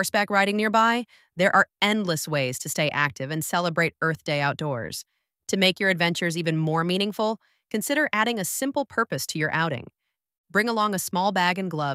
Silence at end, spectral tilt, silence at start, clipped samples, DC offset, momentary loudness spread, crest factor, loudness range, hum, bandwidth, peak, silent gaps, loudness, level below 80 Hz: 0 s; -4 dB/octave; 0 s; under 0.1%; under 0.1%; 9 LU; 20 dB; 3 LU; none; 16 kHz; -4 dBFS; 10.38-10.44 s; -24 LUFS; -66 dBFS